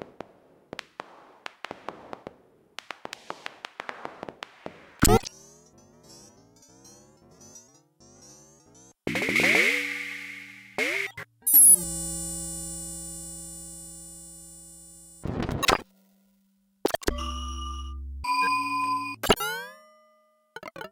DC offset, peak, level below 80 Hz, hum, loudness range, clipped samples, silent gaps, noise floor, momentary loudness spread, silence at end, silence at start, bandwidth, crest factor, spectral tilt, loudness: under 0.1%; -6 dBFS; -44 dBFS; none; 20 LU; under 0.1%; none; -67 dBFS; 24 LU; 0.05 s; 0 s; 17 kHz; 22 dB; -2 dB/octave; -24 LUFS